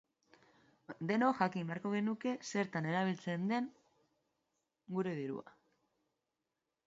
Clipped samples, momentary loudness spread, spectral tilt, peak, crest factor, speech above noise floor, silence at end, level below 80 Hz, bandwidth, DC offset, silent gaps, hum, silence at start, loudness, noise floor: under 0.1%; 11 LU; -5.5 dB/octave; -18 dBFS; 22 dB; 52 dB; 1.35 s; -84 dBFS; 7.6 kHz; under 0.1%; none; none; 0.9 s; -38 LUFS; -89 dBFS